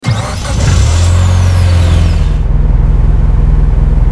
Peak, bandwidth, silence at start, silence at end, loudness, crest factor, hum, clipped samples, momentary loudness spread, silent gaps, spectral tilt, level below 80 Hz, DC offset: 0 dBFS; 11 kHz; 0 s; 0 s; -11 LUFS; 8 dB; none; 0.5%; 4 LU; none; -6 dB/octave; -10 dBFS; under 0.1%